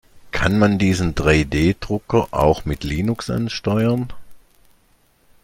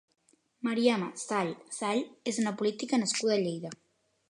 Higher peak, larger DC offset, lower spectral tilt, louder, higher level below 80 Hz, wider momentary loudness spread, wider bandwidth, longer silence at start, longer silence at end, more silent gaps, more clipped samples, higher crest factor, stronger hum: first, -2 dBFS vs -12 dBFS; neither; first, -6.5 dB/octave vs -4 dB/octave; first, -19 LUFS vs -31 LUFS; first, -34 dBFS vs -82 dBFS; about the same, 8 LU vs 9 LU; first, 16.5 kHz vs 11 kHz; second, 0.15 s vs 0.65 s; first, 1.05 s vs 0.55 s; neither; neither; about the same, 18 dB vs 20 dB; neither